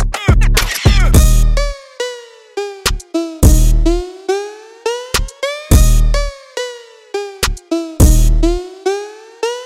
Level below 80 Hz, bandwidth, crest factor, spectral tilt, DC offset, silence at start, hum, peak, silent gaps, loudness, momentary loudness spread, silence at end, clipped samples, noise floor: -14 dBFS; 16 kHz; 12 dB; -5 dB/octave; under 0.1%; 0 s; none; 0 dBFS; none; -15 LUFS; 13 LU; 0 s; under 0.1%; -31 dBFS